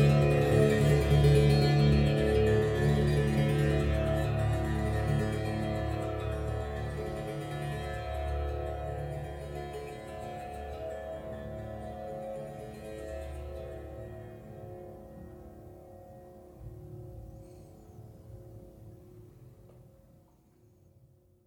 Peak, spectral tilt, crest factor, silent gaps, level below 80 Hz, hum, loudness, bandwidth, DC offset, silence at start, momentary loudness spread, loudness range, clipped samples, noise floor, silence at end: -12 dBFS; -7.5 dB/octave; 20 dB; none; -42 dBFS; none; -30 LUFS; 15.5 kHz; under 0.1%; 0 s; 25 LU; 24 LU; under 0.1%; -63 dBFS; 1.65 s